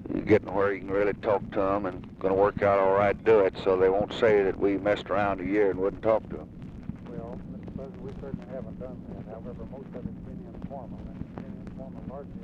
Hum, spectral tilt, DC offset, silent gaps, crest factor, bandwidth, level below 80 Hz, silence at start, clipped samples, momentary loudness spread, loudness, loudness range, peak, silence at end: none; -8 dB/octave; under 0.1%; none; 18 dB; 7.6 kHz; -48 dBFS; 0 s; under 0.1%; 18 LU; -26 LUFS; 16 LU; -10 dBFS; 0 s